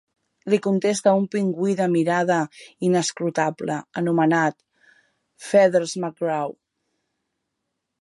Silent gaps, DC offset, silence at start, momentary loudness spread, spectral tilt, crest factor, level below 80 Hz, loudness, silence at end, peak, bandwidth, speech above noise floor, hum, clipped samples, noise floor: none; under 0.1%; 0.45 s; 9 LU; -5.5 dB/octave; 18 dB; -74 dBFS; -22 LUFS; 1.5 s; -4 dBFS; 11.5 kHz; 58 dB; none; under 0.1%; -79 dBFS